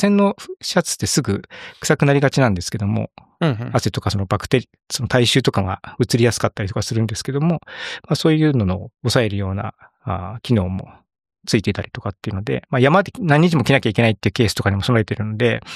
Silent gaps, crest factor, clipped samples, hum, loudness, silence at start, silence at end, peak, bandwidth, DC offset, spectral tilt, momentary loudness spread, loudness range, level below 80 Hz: none; 18 dB; under 0.1%; none; -19 LUFS; 0 s; 0 s; -2 dBFS; 14.5 kHz; under 0.1%; -5.5 dB/octave; 12 LU; 5 LU; -46 dBFS